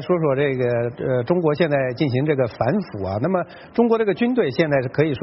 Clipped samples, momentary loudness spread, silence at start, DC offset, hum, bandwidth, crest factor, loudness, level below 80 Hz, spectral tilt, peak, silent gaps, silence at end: under 0.1%; 5 LU; 0 s; under 0.1%; none; 5.8 kHz; 16 dB; -21 LUFS; -54 dBFS; -6.5 dB/octave; -4 dBFS; none; 0 s